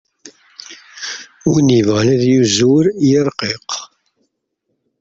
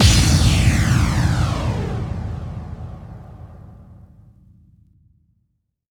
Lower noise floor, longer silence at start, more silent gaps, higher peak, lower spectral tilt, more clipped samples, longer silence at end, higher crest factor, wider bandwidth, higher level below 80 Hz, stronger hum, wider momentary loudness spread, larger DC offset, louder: about the same, -71 dBFS vs -70 dBFS; first, 0.25 s vs 0 s; neither; about the same, -2 dBFS vs 0 dBFS; about the same, -5.5 dB/octave vs -4.5 dB/octave; neither; second, 1.15 s vs 2 s; second, 14 dB vs 20 dB; second, 7.8 kHz vs 18.5 kHz; second, -52 dBFS vs -26 dBFS; neither; second, 20 LU vs 24 LU; neither; first, -14 LUFS vs -18 LUFS